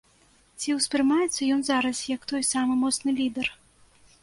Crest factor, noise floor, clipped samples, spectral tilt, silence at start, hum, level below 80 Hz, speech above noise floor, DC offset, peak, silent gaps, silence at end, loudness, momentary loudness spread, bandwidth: 16 dB; -61 dBFS; under 0.1%; -2 dB/octave; 0.6 s; none; -62 dBFS; 35 dB; under 0.1%; -10 dBFS; none; 0.7 s; -25 LUFS; 7 LU; 11.5 kHz